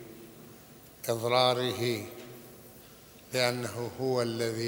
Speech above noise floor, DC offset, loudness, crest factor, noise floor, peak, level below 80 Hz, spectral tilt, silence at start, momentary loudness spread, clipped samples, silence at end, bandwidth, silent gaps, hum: 23 dB; under 0.1%; -30 LUFS; 22 dB; -53 dBFS; -10 dBFS; -68 dBFS; -4.5 dB/octave; 0 s; 25 LU; under 0.1%; 0 s; over 20 kHz; none; none